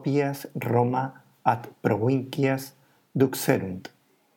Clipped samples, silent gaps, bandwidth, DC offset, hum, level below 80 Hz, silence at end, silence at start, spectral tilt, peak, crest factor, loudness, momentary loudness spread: under 0.1%; none; 18 kHz; under 0.1%; none; -74 dBFS; 0.5 s; 0 s; -6.5 dB/octave; -6 dBFS; 20 dB; -26 LUFS; 12 LU